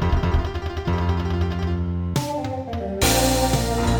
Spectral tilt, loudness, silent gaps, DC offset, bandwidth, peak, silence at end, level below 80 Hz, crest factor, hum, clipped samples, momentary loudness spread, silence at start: -5 dB/octave; -23 LUFS; none; under 0.1%; over 20 kHz; -4 dBFS; 0 s; -28 dBFS; 18 dB; none; under 0.1%; 9 LU; 0 s